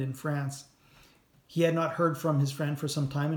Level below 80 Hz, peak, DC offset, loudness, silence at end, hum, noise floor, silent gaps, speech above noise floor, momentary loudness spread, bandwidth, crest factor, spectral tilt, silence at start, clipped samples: -68 dBFS; -14 dBFS; under 0.1%; -30 LUFS; 0 s; none; -61 dBFS; none; 32 dB; 9 LU; 19 kHz; 18 dB; -6.5 dB/octave; 0 s; under 0.1%